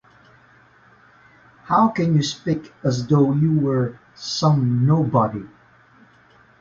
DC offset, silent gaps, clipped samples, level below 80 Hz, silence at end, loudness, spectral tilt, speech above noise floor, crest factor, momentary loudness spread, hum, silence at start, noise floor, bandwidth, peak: under 0.1%; none; under 0.1%; -54 dBFS; 1.15 s; -20 LUFS; -7 dB/octave; 34 dB; 18 dB; 8 LU; none; 1.7 s; -53 dBFS; 7.6 kHz; -2 dBFS